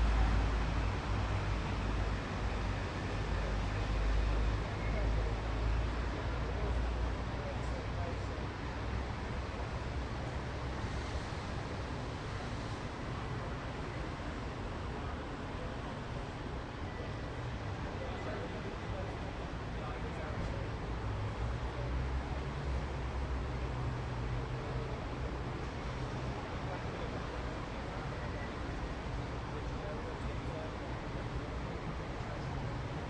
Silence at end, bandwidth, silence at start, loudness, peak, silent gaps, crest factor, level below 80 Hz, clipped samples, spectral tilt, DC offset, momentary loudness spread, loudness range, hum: 0 s; 9.2 kHz; 0 s; -39 LUFS; -20 dBFS; none; 16 dB; -40 dBFS; under 0.1%; -6.5 dB/octave; under 0.1%; 6 LU; 5 LU; none